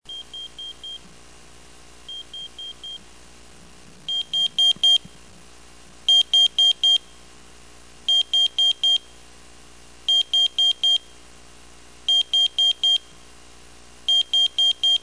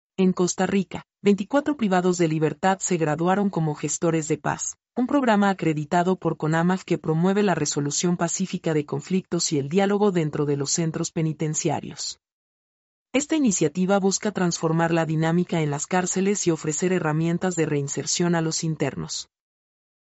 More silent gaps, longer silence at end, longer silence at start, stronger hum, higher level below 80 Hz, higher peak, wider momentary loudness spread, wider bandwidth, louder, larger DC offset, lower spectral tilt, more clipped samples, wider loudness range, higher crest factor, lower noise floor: second, none vs 12.32-13.06 s; second, 0.05 s vs 0.95 s; about the same, 0.1 s vs 0.2 s; first, 60 Hz at -55 dBFS vs none; first, -56 dBFS vs -62 dBFS; about the same, -10 dBFS vs -8 dBFS; first, 20 LU vs 6 LU; first, 11 kHz vs 8.2 kHz; first, -17 LUFS vs -23 LUFS; first, 0.4% vs under 0.1%; second, 1 dB/octave vs -5 dB/octave; neither; first, 16 LU vs 2 LU; about the same, 14 dB vs 16 dB; second, -48 dBFS vs under -90 dBFS